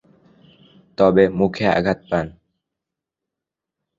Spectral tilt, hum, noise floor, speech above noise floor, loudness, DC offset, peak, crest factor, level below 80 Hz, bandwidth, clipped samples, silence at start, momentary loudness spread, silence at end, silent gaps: -7.5 dB/octave; none; -85 dBFS; 68 dB; -18 LUFS; under 0.1%; 0 dBFS; 20 dB; -48 dBFS; 7.6 kHz; under 0.1%; 1 s; 13 LU; 1.7 s; none